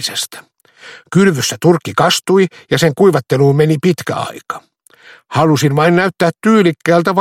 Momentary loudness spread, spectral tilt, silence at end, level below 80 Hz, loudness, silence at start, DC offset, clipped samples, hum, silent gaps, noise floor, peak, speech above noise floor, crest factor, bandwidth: 10 LU; -5.5 dB/octave; 0 s; -54 dBFS; -13 LUFS; 0 s; under 0.1%; under 0.1%; none; none; -43 dBFS; 0 dBFS; 31 dB; 14 dB; 16.5 kHz